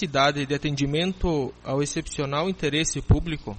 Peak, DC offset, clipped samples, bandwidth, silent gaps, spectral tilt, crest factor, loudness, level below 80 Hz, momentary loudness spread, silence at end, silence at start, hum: -10 dBFS; under 0.1%; under 0.1%; 8.8 kHz; none; -4.5 dB/octave; 16 dB; -25 LUFS; -36 dBFS; 6 LU; 0 s; 0 s; none